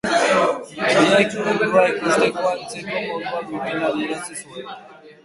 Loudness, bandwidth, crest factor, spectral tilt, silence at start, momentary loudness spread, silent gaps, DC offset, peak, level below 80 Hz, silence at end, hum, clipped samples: -19 LUFS; 11.5 kHz; 18 dB; -4 dB/octave; 0.05 s; 16 LU; none; under 0.1%; -2 dBFS; -60 dBFS; 0.1 s; none; under 0.1%